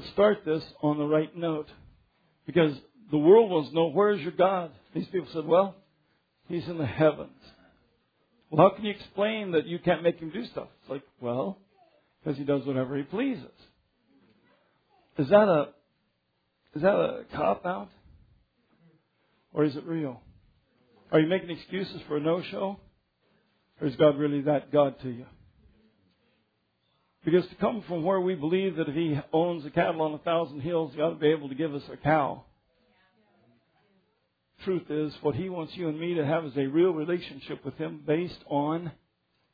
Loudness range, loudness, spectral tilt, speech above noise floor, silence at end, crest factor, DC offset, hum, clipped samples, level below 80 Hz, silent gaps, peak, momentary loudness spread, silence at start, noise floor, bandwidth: 8 LU; -27 LUFS; -9.5 dB/octave; 49 dB; 0.6 s; 24 dB; under 0.1%; none; under 0.1%; -64 dBFS; none; -6 dBFS; 13 LU; 0 s; -76 dBFS; 5 kHz